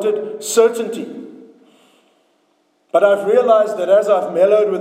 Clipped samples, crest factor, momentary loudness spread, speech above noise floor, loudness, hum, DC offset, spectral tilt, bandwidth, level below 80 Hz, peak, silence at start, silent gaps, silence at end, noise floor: under 0.1%; 16 dB; 12 LU; 47 dB; -15 LUFS; none; under 0.1%; -4 dB/octave; 16 kHz; under -90 dBFS; 0 dBFS; 0 s; none; 0 s; -61 dBFS